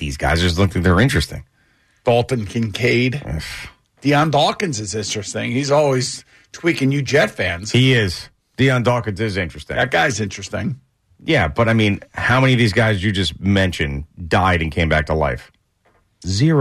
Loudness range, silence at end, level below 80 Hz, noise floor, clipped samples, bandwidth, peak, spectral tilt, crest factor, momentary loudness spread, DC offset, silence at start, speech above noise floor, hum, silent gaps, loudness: 3 LU; 0 s; -36 dBFS; -60 dBFS; under 0.1%; 13.5 kHz; -6 dBFS; -5.5 dB/octave; 14 dB; 12 LU; under 0.1%; 0 s; 43 dB; none; none; -18 LUFS